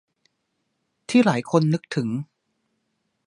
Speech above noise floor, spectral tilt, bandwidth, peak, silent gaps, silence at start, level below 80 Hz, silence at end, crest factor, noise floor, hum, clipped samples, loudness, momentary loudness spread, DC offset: 54 dB; -6.5 dB/octave; 11 kHz; -4 dBFS; none; 1.1 s; -70 dBFS; 1 s; 22 dB; -75 dBFS; none; under 0.1%; -22 LUFS; 18 LU; under 0.1%